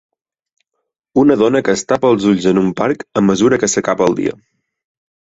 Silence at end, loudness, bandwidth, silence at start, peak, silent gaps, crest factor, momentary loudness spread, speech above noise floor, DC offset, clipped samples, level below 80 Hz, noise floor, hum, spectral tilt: 1 s; -14 LUFS; 8 kHz; 1.15 s; 0 dBFS; none; 14 dB; 6 LU; 61 dB; under 0.1%; under 0.1%; -50 dBFS; -75 dBFS; none; -5 dB/octave